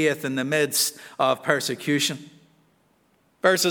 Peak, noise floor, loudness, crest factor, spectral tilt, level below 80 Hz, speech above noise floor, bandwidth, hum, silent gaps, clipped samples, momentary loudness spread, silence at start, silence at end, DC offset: -4 dBFS; -64 dBFS; -23 LUFS; 22 dB; -3 dB/octave; -78 dBFS; 41 dB; over 20 kHz; none; none; under 0.1%; 5 LU; 0 s; 0 s; under 0.1%